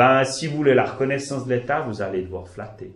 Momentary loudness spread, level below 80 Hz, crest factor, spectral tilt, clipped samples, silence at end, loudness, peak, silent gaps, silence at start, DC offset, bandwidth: 15 LU; -52 dBFS; 18 dB; -5.5 dB/octave; under 0.1%; 0.05 s; -22 LUFS; -2 dBFS; none; 0 s; under 0.1%; 11.5 kHz